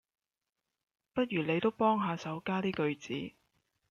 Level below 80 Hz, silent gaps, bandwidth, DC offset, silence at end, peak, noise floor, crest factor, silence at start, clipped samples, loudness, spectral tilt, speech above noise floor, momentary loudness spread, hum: -72 dBFS; none; 7.2 kHz; under 0.1%; 0.6 s; -16 dBFS; -90 dBFS; 18 dB; 1.15 s; under 0.1%; -33 LUFS; -6.5 dB/octave; 58 dB; 11 LU; none